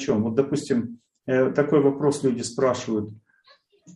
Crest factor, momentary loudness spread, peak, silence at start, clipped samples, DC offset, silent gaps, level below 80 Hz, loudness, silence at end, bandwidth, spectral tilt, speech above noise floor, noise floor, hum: 18 dB; 9 LU; -6 dBFS; 0 s; under 0.1%; under 0.1%; none; -64 dBFS; -23 LUFS; 0.05 s; 11.5 kHz; -6 dB/octave; 36 dB; -59 dBFS; none